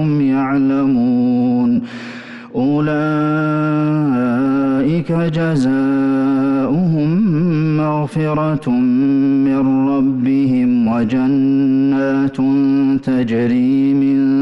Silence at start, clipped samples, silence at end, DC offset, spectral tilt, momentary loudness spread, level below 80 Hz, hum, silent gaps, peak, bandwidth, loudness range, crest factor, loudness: 0 s; under 0.1%; 0 s; under 0.1%; -9 dB/octave; 3 LU; -48 dBFS; none; none; -8 dBFS; 6 kHz; 2 LU; 6 dB; -15 LUFS